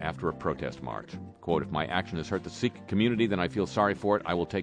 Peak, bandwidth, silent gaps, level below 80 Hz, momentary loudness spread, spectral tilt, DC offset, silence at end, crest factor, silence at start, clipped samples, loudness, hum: -10 dBFS; 9.8 kHz; none; -54 dBFS; 12 LU; -6.5 dB/octave; under 0.1%; 0 s; 20 dB; 0 s; under 0.1%; -30 LUFS; none